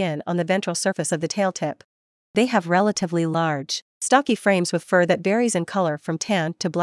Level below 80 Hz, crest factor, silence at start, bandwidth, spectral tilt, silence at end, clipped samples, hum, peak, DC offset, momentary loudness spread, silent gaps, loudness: -72 dBFS; 20 dB; 0 s; 12 kHz; -4.5 dB/octave; 0 s; under 0.1%; none; -2 dBFS; under 0.1%; 7 LU; 1.85-2.34 s, 3.82-4.01 s; -22 LUFS